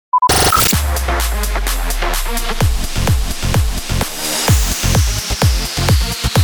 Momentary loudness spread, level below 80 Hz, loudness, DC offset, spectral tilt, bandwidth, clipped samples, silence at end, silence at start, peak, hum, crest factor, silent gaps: 8 LU; -18 dBFS; -15 LUFS; under 0.1%; -3.5 dB/octave; over 20 kHz; under 0.1%; 0 s; 0.15 s; -2 dBFS; none; 14 dB; none